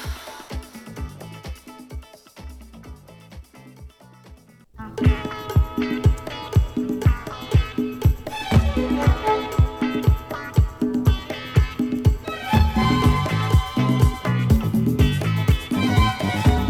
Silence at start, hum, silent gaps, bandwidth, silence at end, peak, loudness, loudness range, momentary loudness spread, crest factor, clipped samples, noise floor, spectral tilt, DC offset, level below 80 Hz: 0 s; none; none; 16 kHz; 0 s; -4 dBFS; -21 LUFS; 18 LU; 18 LU; 18 dB; under 0.1%; -47 dBFS; -7 dB/octave; under 0.1%; -26 dBFS